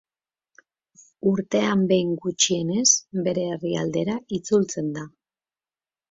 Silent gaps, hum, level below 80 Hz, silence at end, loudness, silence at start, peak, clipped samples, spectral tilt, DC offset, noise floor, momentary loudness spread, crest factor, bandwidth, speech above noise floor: none; none; -64 dBFS; 1.05 s; -23 LUFS; 1.25 s; -4 dBFS; under 0.1%; -4 dB/octave; under 0.1%; under -90 dBFS; 10 LU; 20 dB; 7.8 kHz; over 67 dB